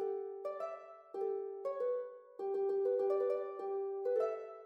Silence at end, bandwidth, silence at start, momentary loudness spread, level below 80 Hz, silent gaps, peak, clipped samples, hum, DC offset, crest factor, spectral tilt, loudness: 0 s; 5.6 kHz; 0 s; 10 LU; under -90 dBFS; none; -24 dBFS; under 0.1%; none; under 0.1%; 14 dB; -6 dB/octave; -38 LUFS